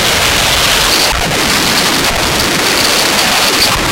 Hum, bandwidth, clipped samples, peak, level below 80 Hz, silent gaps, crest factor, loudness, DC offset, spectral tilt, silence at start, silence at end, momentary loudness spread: none; 17.5 kHz; under 0.1%; 0 dBFS; -28 dBFS; none; 10 dB; -9 LUFS; under 0.1%; -1.5 dB/octave; 0 s; 0 s; 3 LU